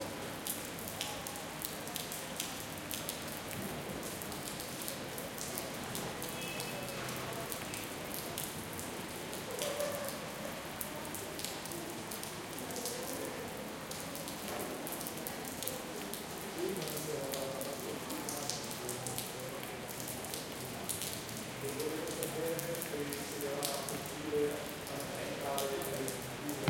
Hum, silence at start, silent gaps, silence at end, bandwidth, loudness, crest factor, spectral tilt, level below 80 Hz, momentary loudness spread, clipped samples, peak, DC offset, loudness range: none; 0 s; none; 0 s; 17 kHz; -39 LUFS; 28 dB; -3 dB/octave; -64 dBFS; 5 LU; under 0.1%; -12 dBFS; under 0.1%; 3 LU